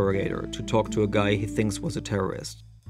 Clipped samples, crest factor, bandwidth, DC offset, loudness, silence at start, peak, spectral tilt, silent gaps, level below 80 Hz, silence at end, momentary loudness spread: under 0.1%; 18 dB; 14 kHz; under 0.1%; -27 LUFS; 0 s; -8 dBFS; -6 dB/octave; none; -44 dBFS; 0 s; 8 LU